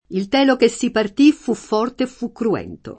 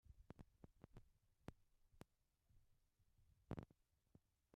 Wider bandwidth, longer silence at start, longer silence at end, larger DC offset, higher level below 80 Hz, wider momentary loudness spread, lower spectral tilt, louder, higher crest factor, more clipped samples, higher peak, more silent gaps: first, 8.8 kHz vs 6.6 kHz; about the same, 0.1 s vs 0.05 s; second, 0.05 s vs 0.35 s; neither; first, -52 dBFS vs -74 dBFS; about the same, 10 LU vs 12 LU; second, -5 dB/octave vs -7.5 dB/octave; first, -18 LUFS vs -62 LUFS; second, 16 dB vs 30 dB; neither; first, -2 dBFS vs -36 dBFS; neither